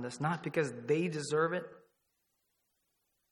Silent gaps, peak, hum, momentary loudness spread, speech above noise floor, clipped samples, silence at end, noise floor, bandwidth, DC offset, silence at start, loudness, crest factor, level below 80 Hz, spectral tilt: none; -18 dBFS; none; 5 LU; 47 dB; under 0.1%; 1.5 s; -81 dBFS; 12 kHz; under 0.1%; 0 s; -34 LUFS; 20 dB; -80 dBFS; -5.5 dB/octave